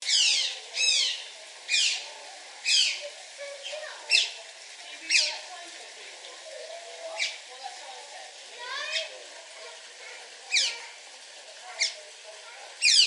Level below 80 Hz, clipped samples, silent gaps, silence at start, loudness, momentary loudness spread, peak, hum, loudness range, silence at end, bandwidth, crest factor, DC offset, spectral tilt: under -90 dBFS; under 0.1%; none; 0 s; -25 LUFS; 20 LU; -8 dBFS; none; 9 LU; 0 s; 11.5 kHz; 24 dB; under 0.1%; 6.5 dB/octave